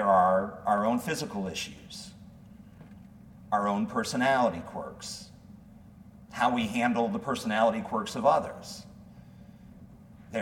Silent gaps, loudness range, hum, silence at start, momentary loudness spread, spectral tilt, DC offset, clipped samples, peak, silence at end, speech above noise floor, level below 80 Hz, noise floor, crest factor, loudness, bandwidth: none; 4 LU; none; 0 s; 18 LU; -5 dB/octave; under 0.1%; under 0.1%; -10 dBFS; 0 s; 22 dB; -60 dBFS; -51 dBFS; 20 dB; -28 LUFS; 17.5 kHz